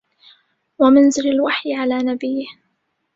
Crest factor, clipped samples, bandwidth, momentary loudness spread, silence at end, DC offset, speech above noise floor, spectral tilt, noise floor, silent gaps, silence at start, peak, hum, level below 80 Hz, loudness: 16 dB; under 0.1%; 7.8 kHz; 13 LU; 0.65 s; under 0.1%; 54 dB; -3 dB/octave; -70 dBFS; none; 0.8 s; -2 dBFS; none; -60 dBFS; -17 LUFS